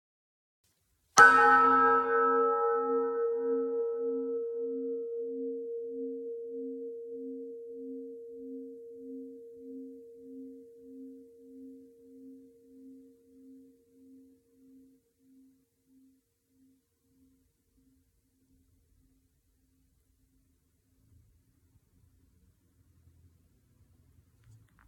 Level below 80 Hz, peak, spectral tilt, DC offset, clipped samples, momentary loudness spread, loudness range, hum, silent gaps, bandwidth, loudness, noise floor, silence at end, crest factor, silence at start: -74 dBFS; -6 dBFS; -2.5 dB/octave; under 0.1%; under 0.1%; 28 LU; 27 LU; none; none; 15.5 kHz; -27 LUFS; -73 dBFS; 11.3 s; 28 dB; 1.15 s